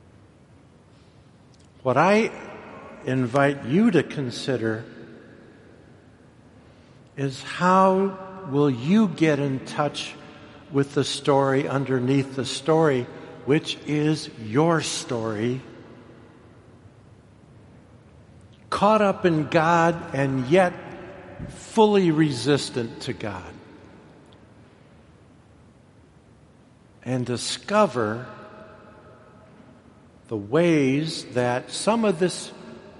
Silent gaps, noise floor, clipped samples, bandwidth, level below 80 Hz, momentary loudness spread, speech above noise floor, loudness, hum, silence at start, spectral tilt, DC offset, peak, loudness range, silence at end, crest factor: none; -53 dBFS; under 0.1%; 11.5 kHz; -60 dBFS; 19 LU; 31 dB; -23 LUFS; none; 1.85 s; -5.5 dB/octave; under 0.1%; -4 dBFS; 10 LU; 0.1 s; 22 dB